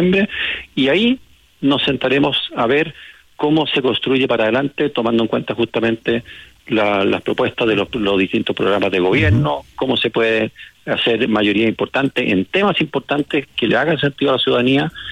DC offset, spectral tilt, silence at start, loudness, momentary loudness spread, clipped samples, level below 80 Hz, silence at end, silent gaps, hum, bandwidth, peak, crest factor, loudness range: under 0.1%; -7 dB/octave; 0 s; -17 LUFS; 6 LU; under 0.1%; -48 dBFS; 0 s; none; none; 11.5 kHz; -6 dBFS; 12 dB; 1 LU